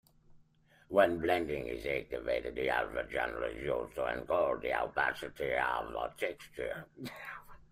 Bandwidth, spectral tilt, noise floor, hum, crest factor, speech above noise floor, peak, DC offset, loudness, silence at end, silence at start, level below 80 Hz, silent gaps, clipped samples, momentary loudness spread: 15.5 kHz; -5.5 dB/octave; -66 dBFS; none; 22 dB; 31 dB; -14 dBFS; under 0.1%; -34 LUFS; 0.1 s; 0.3 s; -58 dBFS; none; under 0.1%; 12 LU